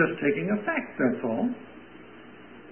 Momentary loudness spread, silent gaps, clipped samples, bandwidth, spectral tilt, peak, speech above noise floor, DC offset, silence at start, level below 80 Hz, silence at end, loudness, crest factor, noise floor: 21 LU; none; under 0.1%; 3.3 kHz; -11 dB/octave; -10 dBFS; 20 dB; 0.2%; 0 s; -66 dBFS; 0 s; -27 LUFS; 18 dB; -48 dBFS